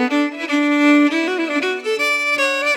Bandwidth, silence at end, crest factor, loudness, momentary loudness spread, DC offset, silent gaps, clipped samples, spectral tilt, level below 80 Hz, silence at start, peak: 15.5 kHz; 0 s; 14 dB; -17 LUFS; 6 LU; under 0.1%; none; under 0.1%; -1.5 dB/octave; -86 dBFS; 0 s; -4 dBFS